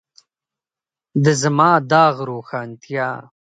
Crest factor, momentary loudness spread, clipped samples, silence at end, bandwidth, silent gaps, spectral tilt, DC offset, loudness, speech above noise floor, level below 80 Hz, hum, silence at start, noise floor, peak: 18 dB; 14 LU; under 0.1%; 0.25 s; 9.4 kHz; none; -5.5 dB/octave; under 0.1%; -17 LUFS; over 73 dB; -66 dBFS; none; 1.15 s; under -90 dBFS; 0 dBFS